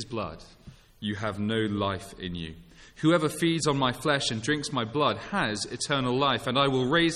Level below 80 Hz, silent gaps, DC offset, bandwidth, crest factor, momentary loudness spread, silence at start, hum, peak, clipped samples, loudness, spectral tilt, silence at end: -54 dBFS; none; under 0.1%; 14.5 kHz; 18 dB; 12 LU; 0 s; none; -10 dBFS; under 0.1%; -27 LUFS; -4.5 dB/octave; 0 s